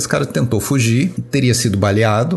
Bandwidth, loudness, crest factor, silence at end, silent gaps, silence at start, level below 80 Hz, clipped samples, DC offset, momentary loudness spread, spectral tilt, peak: 12.5 kHz; -16 LUFS; 16 dB; 0 s; none; 0 s; -44 dBFS; under 0.1%; under 0.1%; 3 LU; -5.5 dB/octave; 0 dBFS